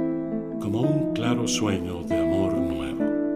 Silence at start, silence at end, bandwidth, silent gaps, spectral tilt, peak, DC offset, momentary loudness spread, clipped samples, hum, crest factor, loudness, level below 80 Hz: 0 s; 0 s; 15.5 kHz; none; -5.5 dB/octave; -10 dBFS; under 0.1%; 5 LU; under 0.1%; none; 16 dB; -25 LUFS; -48 dBFS